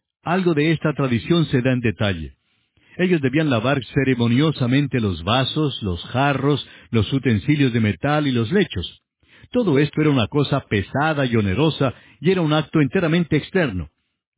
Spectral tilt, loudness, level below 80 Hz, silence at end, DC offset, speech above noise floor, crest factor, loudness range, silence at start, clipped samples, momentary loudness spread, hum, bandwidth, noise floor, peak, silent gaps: -11 dB/octave; -20 LUFS; -42 dBFS; 0.5 s; under 0.1%; 43 dB; 16 dB; 1 LU; 0.25 s; under 0.1%; 6 LU; none; 4 kHz; -63 dBFS; -4 dBFS; none